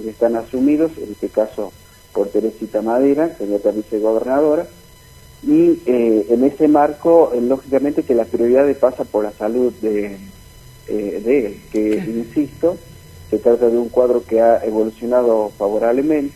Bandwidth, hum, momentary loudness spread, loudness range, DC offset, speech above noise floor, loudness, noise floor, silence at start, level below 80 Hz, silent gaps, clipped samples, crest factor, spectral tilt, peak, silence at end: 15.5 kHz; none; 9 LU; 6 LU; under 0.1%; 27 dB; -17 LUFS; -43 dBFS; 0 s; -48 dBFS; none; under 0.1%; 16 dB; -7.5 dB/octave; 0 dBFS; 0 s